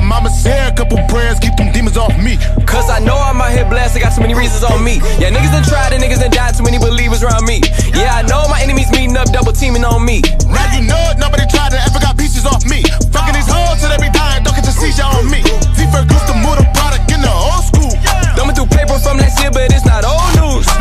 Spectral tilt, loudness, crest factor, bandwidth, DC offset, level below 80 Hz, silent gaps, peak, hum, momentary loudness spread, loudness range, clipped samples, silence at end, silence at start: -4.5 dB/octave; -12 LUFS; 8 dB; 15 kHz; under 0.1%; -10 dBFS; none; 0 dBFS; none; 2 LU; 1 LU; under 0.1%; 0 s; 0 s